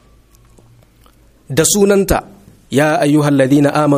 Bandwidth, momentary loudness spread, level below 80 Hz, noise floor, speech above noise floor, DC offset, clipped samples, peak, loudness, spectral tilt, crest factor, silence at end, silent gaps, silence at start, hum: 15.5 kHz; 8 LU; -38 dBFS; -48 dBFS; 36 dB; under 0.1%; under 0.1%; 0 dBFS; -13 LUFS; -5 dB/octave; 14 dB; 0 s; none; 1.5 s; none